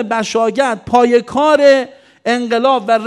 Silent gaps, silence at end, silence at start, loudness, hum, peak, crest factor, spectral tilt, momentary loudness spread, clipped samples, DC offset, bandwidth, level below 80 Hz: none; 0 s; 0 s; -13 LUFS; none; 0 dBFS; 14 dB; -4 dB/octave; 8 LU; 0.2%; under 0.1%; 11.5 kHz; -52 dBFS